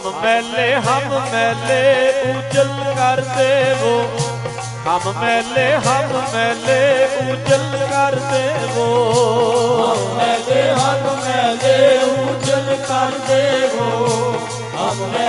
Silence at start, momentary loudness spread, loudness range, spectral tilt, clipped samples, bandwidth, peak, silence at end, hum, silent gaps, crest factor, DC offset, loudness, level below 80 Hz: 0 s; 5 LU; 2 LU; -4 dB/octave; under 0.1%; 11.5 kHz; 0 dBFS; 0 s; none; none; 16 dB; under 0.1%; -16 LUFS; -52 dBFS